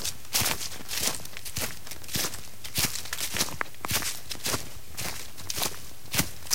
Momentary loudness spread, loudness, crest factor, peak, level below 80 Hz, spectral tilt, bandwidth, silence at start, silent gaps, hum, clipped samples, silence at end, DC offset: 8 LU; -30 LUFS; 28 dB; -4 dBFS; -50 dBFS; -1.5 dB/octave; 17 kHz; 0 s; none; none; under 0.1%; 0 s; 2%